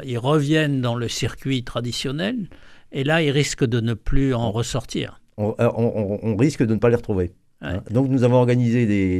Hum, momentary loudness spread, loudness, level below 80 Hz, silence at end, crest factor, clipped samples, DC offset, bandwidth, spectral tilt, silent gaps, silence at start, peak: none; 10 LU; -21 LUFS; -36 dBFS; 0 s; 16 dB; under 0.1%; under 0.1%; 14 kHz; -6 dB/octave; none; 0 s; -4 dBFS